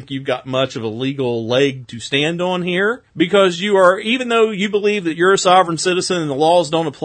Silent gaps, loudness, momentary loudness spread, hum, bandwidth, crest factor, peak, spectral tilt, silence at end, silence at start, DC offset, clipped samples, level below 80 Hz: none; -16 LUFS; 8 LU; none; 9.4 kHz; 16 dB; 0 dBFS; -4.5 dB/octave; 0 s; 0 s; under 0.1%; under 0.1%; -60 dBFS